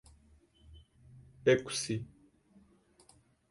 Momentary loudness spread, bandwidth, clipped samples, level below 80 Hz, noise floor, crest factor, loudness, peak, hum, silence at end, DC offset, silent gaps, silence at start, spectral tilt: 12 LU; 11.5 kHz; under 0.1%; -64 dBFS; -65 dBFS; 24 dB; -32 LUFS; -14 dBFS; none; 1.45 s; under 0.1%; none; 0.7 s; -4.5 dB/octave